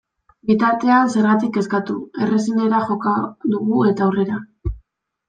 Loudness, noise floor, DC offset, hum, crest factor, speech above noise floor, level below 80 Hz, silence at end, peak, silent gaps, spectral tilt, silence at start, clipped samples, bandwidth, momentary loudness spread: -18 LUFS; -57 dBFS; under 0.1%; none; 16 dB; 39 dB; -40 dBFS; 0.5 s; -2 dBFS; none; -7 dB/octave; 0.45 s; under 0.1%; 9.2 kHz; 12 LU